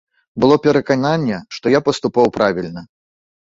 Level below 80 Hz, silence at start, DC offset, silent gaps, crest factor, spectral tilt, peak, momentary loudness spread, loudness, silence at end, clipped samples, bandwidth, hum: -52 dBFS; 0.35 s; under 0.1%; none; 16 dB; -6 dB/octave; -2 dBFS; 13 LU; -16 LUFS; 0.75 s; under 0.1%; 7.8 kHz; none